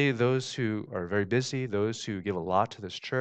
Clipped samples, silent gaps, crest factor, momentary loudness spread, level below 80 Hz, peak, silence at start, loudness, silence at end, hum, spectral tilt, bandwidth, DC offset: under 0.1%; none; 18 dB; 6 LU; -66 dBFS; -10 dBFS; 0 s; -30 LUFS; 0 s; none; -5.5 dB/octave; 9 kHz; under 0.1%